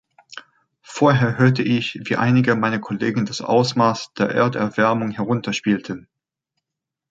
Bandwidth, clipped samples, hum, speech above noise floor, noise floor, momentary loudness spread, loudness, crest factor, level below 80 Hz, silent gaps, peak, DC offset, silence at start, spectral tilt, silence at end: 7.8 kHz; under 0.1%; none; 66 dB; -84 dBFS; 17 LU; -19 LUFS; 18 dB; -60 dBFS; none; -2 dBFS; under 0.1%; 0.35 s; -6.5 dB/octave; 1.1 s